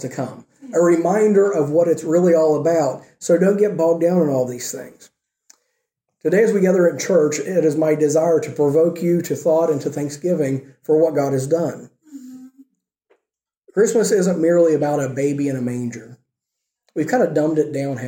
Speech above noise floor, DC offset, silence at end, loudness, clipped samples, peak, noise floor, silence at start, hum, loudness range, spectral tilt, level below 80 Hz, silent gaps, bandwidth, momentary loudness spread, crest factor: 65 dB; under 0.1%; 0 s; -18 LUFS; under 0.1%; -4 dBFS; -82 dBFS; 0 s; none; 5 LU; -6.5 dB/octave; -68 dBFS; none; 17 kHz; 11 LU; 14 dB